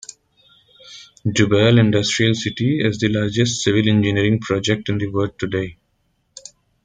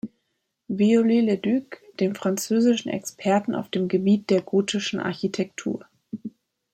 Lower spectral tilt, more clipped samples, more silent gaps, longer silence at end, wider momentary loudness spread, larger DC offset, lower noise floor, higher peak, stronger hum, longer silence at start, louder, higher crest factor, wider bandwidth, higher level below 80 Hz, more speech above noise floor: about the same, -5.5 dB/octave vs -5.5 dB/octave; neither; neither; first, 1.1 s vs 0.45 s; first, 22 LU vs 17 LU; neither; second, -66 dBFS vs -76 dBFS; first, -2 dBFS vs -8 dBFS; neither; first, 0.85 s vs 0.05 s; first, -18 LUFS vs -23 LUFS; about the same, 18 dB vs 16 dB; second, 9.4 kHz vs 15.5 kHz; first, -50 dBFS vs -68 dBFS; second, 49 dB vs 54 dB